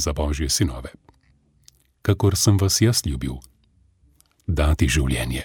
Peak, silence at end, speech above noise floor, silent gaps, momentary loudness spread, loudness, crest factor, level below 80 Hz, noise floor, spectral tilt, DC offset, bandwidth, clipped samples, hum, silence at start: -4 dBFS; 0 s; 39 dB; none; 16 LU; -21 LUFS; 18 dB; -30 dBFS; -60 dBFS; -4.5 dB/octave; under 0.1%; 17.5 kHz; under 0.1%; none; 0 s